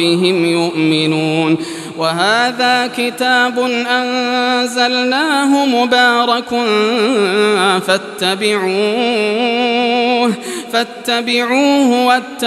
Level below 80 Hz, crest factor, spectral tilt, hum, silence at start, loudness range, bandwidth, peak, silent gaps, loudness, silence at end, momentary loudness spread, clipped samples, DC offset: -66 dBFS; 14 dB; -4 dB/octave; none; 0 s; 2 LU; 14.5 kHz; 0 dBFS; none; -13 LUFS; 0 s; 5 LU; under 0.1%; under 0.1%